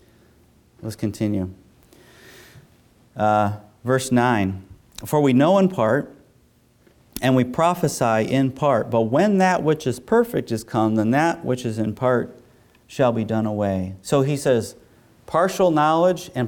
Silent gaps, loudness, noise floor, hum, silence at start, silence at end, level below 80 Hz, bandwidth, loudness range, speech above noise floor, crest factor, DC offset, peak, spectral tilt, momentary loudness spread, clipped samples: none; -20 LUFS; -57 dBFS; none; 0.8 s; 0 s; -56 dBFS; 19 kHz; 4 LU; 38 dB; 16 dB; under 0.1%; -6 dBFS; -6.5 dB/octave; 12 LU; under 0.1%